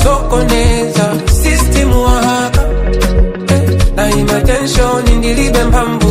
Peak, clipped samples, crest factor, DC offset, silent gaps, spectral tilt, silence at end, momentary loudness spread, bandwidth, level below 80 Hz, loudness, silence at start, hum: 0 dBFS; under 0.1%; 10 dB; under 0.1%; none; -5 dB/octave; 0 s; 2 LU; 16 kHz; -12 dBFS; -12 LUFS; 0 s; none